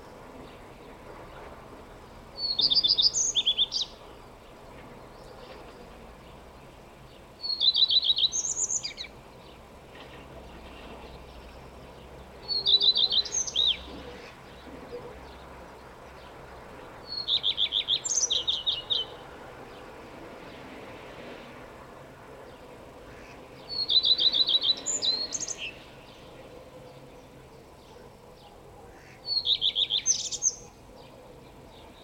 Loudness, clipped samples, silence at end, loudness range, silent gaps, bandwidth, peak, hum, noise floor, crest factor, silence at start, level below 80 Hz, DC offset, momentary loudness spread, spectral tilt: -24 LUFS; under 0.1%; 0 s; 20 LU; none; 16.5 kHz; -10 dBFS; none; -50 dBFS; 22 dB; 0 s; -56 dBFS; under 0.1%; 27 LU; 0 dB/octave